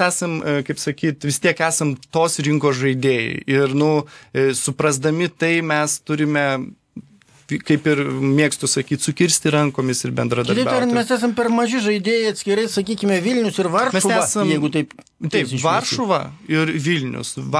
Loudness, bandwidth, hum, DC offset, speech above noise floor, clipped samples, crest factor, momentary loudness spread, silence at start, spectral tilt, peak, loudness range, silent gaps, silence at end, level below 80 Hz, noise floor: -19 LUFS; 11 kHz; none; under 0.1%; 25 dB; under 0.1%; 18 dB; 5 LU; 0 s; -4.5 dB/octave; -2 dBFS; 2 LU; none; 0 s; -60 dBFS; -44 dBFS